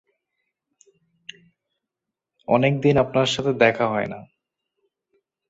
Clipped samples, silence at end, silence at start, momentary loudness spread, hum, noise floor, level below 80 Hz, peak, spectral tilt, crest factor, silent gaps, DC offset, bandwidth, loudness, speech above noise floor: under 0.1%; 1.25 s; 2.5 s; 23 LU; none; -85 dBFS; -56 dBFS; -2 dBFS; -5.5 dB/octave; 22 dB; none; under 0.1%; 8 kHz; -20 LUFS; 66 dB